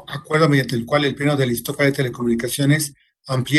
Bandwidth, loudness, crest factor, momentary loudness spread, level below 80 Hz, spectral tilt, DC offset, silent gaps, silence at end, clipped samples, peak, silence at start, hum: 13 kHz; -19 LUFS; 18 dB; 6 LU; -52 dBFS; -5.5 dB/octave; under 0.1%; none; 0 s; under 0.1%; -2 dBFS; 0.1 s; none